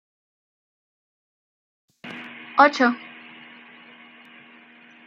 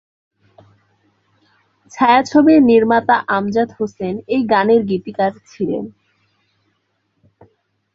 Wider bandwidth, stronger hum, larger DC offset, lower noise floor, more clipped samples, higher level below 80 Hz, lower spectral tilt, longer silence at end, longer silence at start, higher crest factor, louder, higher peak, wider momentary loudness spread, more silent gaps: about the same, 7.6 kHz vs 7.6 kHz; neither; neither; second, -50 dBFS vs -67 dBFS; neither; second, -86 dBFS vs -58 dBFS; second, -3.5 dB/octave vs -6.5 dB/octave; about the same, 2.1 s vs 2.05 s; about the same, 2.05 s vs 1.95 s; first, 26 dB vs 16 dB; second, -19 LUFS vs -15 LUFS; about the same, -2 dBFS vs -2 dBFS; first, 27 LU vs 13 LU; neither